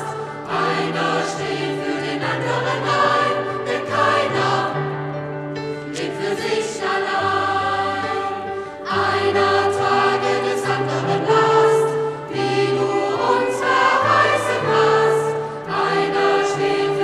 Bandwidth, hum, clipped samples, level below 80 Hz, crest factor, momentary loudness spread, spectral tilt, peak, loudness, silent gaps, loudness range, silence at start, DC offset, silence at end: 12.5 kHz; none; under 0.1%; -58 dBFS; 16 dB; 10 LU; -4.5 dB/octave; -4 dBFS; -19 LUFS; none; 5 LU; 0 s; under 0.1%; 0 s